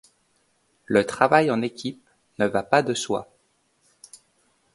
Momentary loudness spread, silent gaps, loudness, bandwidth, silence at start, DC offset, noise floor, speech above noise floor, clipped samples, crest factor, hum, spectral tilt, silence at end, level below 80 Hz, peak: 11 LU; none; -23 LUFS; 11.5 kHz; 0.9 s; under 0.1%; -67 dBFS; 45 dB; under 0.1%; 24 dB; none; -4.5 dB/octave; 1.5 s; -64 dBFS; 0 dBFS